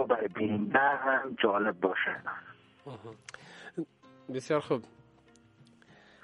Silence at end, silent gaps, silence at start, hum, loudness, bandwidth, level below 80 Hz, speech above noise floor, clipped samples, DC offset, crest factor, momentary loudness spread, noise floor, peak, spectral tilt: 1.35 s; none; 0 s; none; -30 LUFS; 11 kHz; -74 dBFS; 31 dB; under 0.1%; under 0.1%; 22 dB; 22 LU; -61 dBFS; -10 dBFS; -5.5 dB/octave